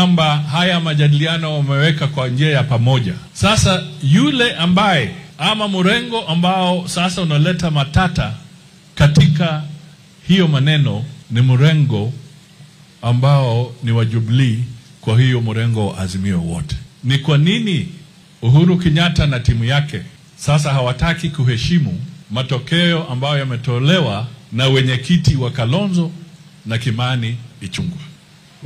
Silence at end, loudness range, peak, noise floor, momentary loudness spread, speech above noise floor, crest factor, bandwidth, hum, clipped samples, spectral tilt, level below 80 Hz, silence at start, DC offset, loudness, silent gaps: 0 s; 3 LU; -2 dBFS; -44 dBFS; 12 LU; 30 dB; 14 dB; 11.5 kHz; none; under 0.1%; -6 dB/octave; -36 dBFS; 0 s; under 0.1%; -16 LUFS; none